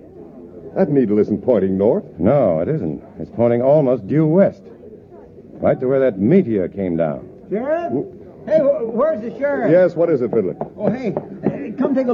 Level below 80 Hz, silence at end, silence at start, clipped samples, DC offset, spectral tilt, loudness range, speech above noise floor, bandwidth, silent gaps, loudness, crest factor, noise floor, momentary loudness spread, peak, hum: -54 dBFS; 0 s; 0.15 s; under 0.1%; under 0.1%; -10.5 dB/octave; 2 LU; 24 dB; 6.2 kHz; none; -18 LUFS; 14 dB; -41 dBFS; 11 LU; -2 dBFS; none